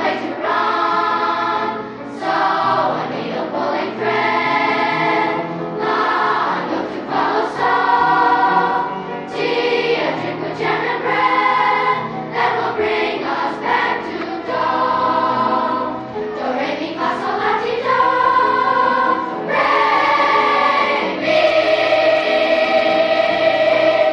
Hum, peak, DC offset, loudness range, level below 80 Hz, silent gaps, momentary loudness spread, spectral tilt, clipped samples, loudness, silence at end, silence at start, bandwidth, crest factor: none; -2 dBFS; under 0.1%; 4 LU; -56 dBFS; none; 8 LU; -5 dB/octave; under 0.1%; -17 LUFS; 0 s; 0 s; 9.6 kHz; 14 dB